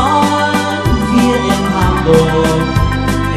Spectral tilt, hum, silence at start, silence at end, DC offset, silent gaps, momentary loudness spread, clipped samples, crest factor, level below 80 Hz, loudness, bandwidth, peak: -6 dB/octave; none; 0 s; 0 s; under 0.1%; none; 4 LU; under 0.1%; 12 dB; -22 dBFS; -12 LUFS; 15 kHz; 0 dBFS